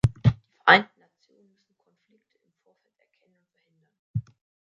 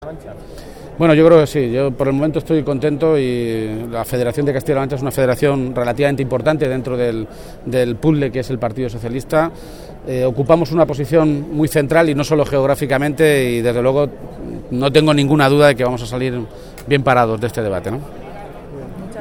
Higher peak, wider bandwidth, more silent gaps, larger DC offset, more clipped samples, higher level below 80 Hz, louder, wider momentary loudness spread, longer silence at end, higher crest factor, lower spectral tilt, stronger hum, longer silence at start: about the same, 0 dBFS vs 0 dBFS; second, 10.5 kHz vs 18 kHz; first, 3.99-4.14 s vs none; neither; neither; second, -48 dBFS vs -38 dBFS; second, -22 LUFS vs -16 LUFS; about the same, 17 LU vs 19 LU; first, 0.5 s vs 0 s; first, 28 dB vs 16 dB; about the same, -6.5 dB/octave vs -6.5 dB/octave; neither; about the same, 0.05 s vs 0 s